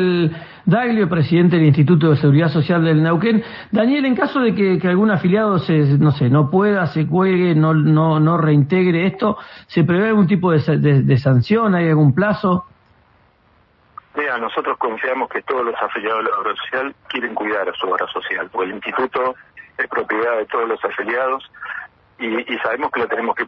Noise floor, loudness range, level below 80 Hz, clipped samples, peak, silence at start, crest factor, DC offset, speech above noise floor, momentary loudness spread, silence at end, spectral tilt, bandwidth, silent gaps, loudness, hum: -56 dBFS; 7 LU; -54 dBFS; under 0.1%; -2 dBFS; 0 s; 14 dB; under 0.1%; 39 dB; 9 LU; 0 s; -10.5 dB/octave; 5.6 kHz; none; -17 LUFS; none